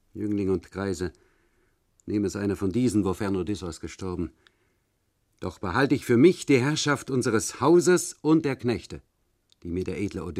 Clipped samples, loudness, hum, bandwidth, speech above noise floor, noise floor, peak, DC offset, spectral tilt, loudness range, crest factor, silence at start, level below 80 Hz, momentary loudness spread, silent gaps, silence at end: under 0.1%; -25 LUFS; none; 14.5 kHz; 47 dB; -72 dBFS; -6 dBFS; under 0.1%; -5.5 dB/octave; 7 LU; 20 dB; 0.15 s; -54 dBFS; 16 LU; none; 0 s